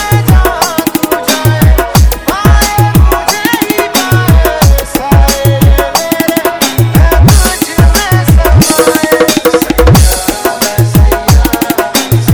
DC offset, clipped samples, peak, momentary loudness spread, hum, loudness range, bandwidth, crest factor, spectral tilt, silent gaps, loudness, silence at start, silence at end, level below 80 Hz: 0.3%; 1%; 0 dBFS; 5 LU; none; 1 LU; 20 kHz; 6 dB; -5 dB/octave; none; -8 LUFS; 0 s; 0 s; -12 dBFS